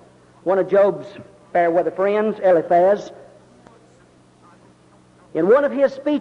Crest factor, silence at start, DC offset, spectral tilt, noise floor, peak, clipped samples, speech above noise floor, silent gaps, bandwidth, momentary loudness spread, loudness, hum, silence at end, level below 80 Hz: 14 dB; 0.45 s; under 0.1%; -7.5 dB/octave; -52 dBFS; -6 dBFS; under 0.1%; 34 dB; none; 7.4 kHz; 13 LU; -18 LUFS; none; 0 s; -64 dBFS